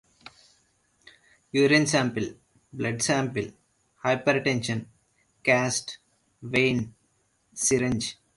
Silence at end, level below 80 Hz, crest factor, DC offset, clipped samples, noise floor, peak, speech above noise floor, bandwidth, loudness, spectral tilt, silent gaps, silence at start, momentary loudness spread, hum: 0.25 s; -60 dBFS; 22 dB; under 0.1%; under 0.1%; -69 dBFS; -6 dBFS; 44 dB; 11.5 kHz; -25 LUFS; -4 dB/octave; none; 1.55 s; 18 LU; none